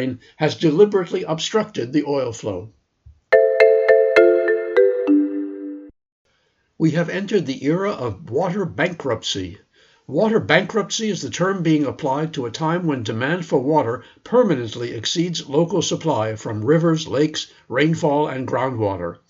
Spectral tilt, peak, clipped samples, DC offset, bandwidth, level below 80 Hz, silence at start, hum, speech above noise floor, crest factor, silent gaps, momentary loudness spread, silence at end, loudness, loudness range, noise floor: -5.5 dB/octave; 0 dBFS; under 0.1%; under 0.1%; 7.8 kHz; -60 dBFS; 0 s; none; 45 dB; 20 dB; 6.12-6.25 s; 11 LU; 0.15 s; -19 LUFS; 6 LU; -66 dBFS